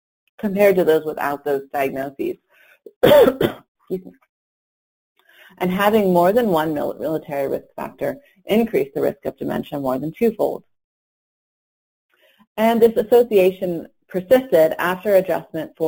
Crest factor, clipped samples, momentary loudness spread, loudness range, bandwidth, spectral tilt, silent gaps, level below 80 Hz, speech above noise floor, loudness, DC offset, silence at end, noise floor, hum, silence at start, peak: 18 dB; under 0.1%; 15 LU; 6 LU; 17 kHz; -6.5 dB/octave; 2.96-3.01 s, 3.68-3.75 s, 4.29-5.16 s, 10.84-12.09 s, 12.47-12.55 s; -54 dBFS; over 72 dB; -19 LUFS; under 0.1%; 0 s; under -90 dBFS; none; 0.4 s; -2 dBFS